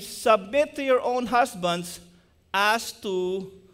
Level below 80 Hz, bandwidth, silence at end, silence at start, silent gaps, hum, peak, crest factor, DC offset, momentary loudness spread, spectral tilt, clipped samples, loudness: -60 dBFS; 16 kHz; 0.15 s; 0 s; none; none; -8 dBFS; 18 dB; under 0.1%; 9 LU; -3.5 dB/octave; under 0.1%; -24 LUFS